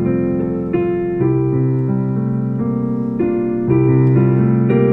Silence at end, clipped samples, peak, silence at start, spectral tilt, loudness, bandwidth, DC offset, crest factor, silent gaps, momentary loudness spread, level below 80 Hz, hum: 0 s; under 0.1%; -2 dBFS; 0 s; -12.5 dB/octave; -16 LUFS; 3 kHz; under 0.1%; 14 dB; none; 6 LU; -42 dBFS; none